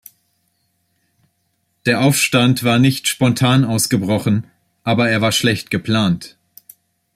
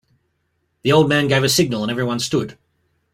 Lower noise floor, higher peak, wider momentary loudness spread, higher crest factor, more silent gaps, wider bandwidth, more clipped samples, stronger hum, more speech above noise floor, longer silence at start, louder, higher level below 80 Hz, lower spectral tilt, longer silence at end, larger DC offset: about the same, -67 dBFS vs -69 dBFS; about the same, -2 dBFS vs -2 dBFS; about the same, 7 LU vs 9 LU; about the same, 16 dB vs 18 dB; neither; about the same, 16 kHz vs 16 kHz; neither; neither; about the same, 52 dB vs 52 dB; first, 1.85 s vs 0.85 s; about the same, -16 LUFS vs -18 LUFS; about the same, -54 dBFS vs -54 dBFS; about the same, -4.5 dB/octave vs -4.5 dB/octave; first, 0.85 s vs 0.6 s; neither